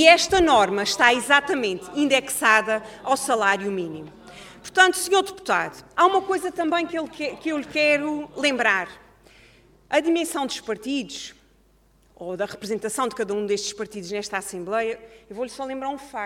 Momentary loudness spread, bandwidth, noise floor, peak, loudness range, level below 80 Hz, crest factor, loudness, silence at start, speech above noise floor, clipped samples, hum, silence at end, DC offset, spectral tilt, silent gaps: 15 LU; 17 kHz; -59 dBFS; 0 dBFS; 8 LU; -54 dBFS; 22 dB; -22 LUFS; 0 s; 36 dB; under 0.1%; none; 0 s; under 0.1%; -2.5 dB/octave; none